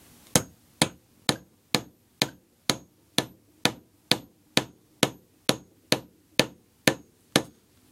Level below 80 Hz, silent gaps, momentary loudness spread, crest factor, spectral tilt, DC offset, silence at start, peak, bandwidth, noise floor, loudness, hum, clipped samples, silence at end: -60 dBFS; none; 10 LU; 30 dB; -2.5 dB/octave; under 0.1%; 0.35 s; 0 dBFS; 16.5 kHz; -50 dBFS; -28 LUFS; none; under 0.1%; 0.45 s